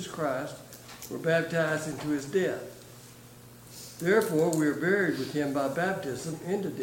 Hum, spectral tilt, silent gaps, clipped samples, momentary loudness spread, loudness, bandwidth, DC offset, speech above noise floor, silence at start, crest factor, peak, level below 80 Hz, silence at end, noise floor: none; -5.5 dB/octave; none; under 0.1%; 22 LU; -29 LUFS; 17 kHz; under 0.1%; 22 dB; 0 s; 18 dB; -12 dBFS; -66 dBFS; 0 s; -50 dBFS